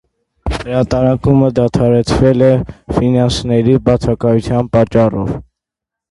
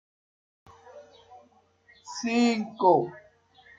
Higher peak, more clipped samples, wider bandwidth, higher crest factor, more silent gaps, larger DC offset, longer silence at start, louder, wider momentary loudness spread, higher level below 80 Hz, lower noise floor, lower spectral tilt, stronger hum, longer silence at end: first, 0 dBFS vs -8 dBFS; neither; first, 11.5 kHz vs 7.8 kHz; second, 12 dB vs 22 dB; neither; neither; second, 0.45 s vs 0.95 s; first, -13 LUFS vs -25 LUFS; second, 9 LU vs 14 LU; first, -30 dBFS vs -72 dBFS; first, -83 dBFS vs -61 dBFS; first, -7.5 dB/octave vs -5 dB/octave; neither; about the same, 0.7 s vs 0.6 s